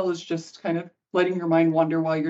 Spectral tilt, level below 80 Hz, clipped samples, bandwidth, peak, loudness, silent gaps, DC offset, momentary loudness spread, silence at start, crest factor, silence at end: -7 dB/octave; -74 dBFS; under 0.1%; 7.8 kHz; -6 dBFS; -24 LUFS; none; under 0.1%; 9 LU; 0 s; 16 dB; 0 s